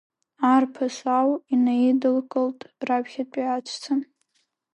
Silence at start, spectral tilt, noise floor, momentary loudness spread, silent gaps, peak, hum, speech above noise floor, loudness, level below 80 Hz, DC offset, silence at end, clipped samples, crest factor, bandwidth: 0.4 s; -4.5 dB/octave; -72 dBFS; 8 LU; none; -8 dBFS; none; 49 dB; -24 LUFS; -80 dBFS; under 0.1%; 0.7 s; under 0.1%; 16 dB; 8.8 kHz